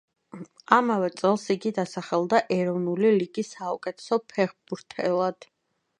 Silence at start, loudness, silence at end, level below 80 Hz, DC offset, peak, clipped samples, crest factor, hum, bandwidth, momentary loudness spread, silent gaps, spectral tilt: 0.35 s; -25 LUFS; 0.65 s; -74 dBFS; under 0.1%; -2 dBFS; under 0.1%; 24 dB; none; 10.5 kHz; 11 LU; none; -6 dB/octave